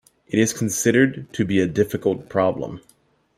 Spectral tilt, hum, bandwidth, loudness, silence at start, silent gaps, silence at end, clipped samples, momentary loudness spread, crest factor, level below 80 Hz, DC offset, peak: -5 dB/octave; none; 16 kHz; -21 LUFS; 0.3 s; none; 0.6 s; under 0.1%; 10 LU; 18 dB; -56 dBFS; under 0.1%; -4 dBFS